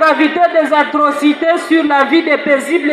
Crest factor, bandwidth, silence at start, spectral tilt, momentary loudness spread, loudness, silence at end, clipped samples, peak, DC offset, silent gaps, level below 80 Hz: 12 dB; 13.5 kHz; 0 s; -3.5 dB/octave; 2 LU; -12 LUFS; 0 s; under 0.1%; 0 dBFS; under 0.1%; none; -66 dBFS